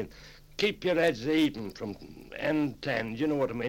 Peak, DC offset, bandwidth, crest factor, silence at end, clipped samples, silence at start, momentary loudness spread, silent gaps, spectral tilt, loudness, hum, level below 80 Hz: -12 dBFS; under 0.1%; 16.5 kHz; 18 dB; 0 s; under 0.1%; 0 s; 15 LU; none; -5.5 dB/octave; -30 LUFS; none; -56 dBFS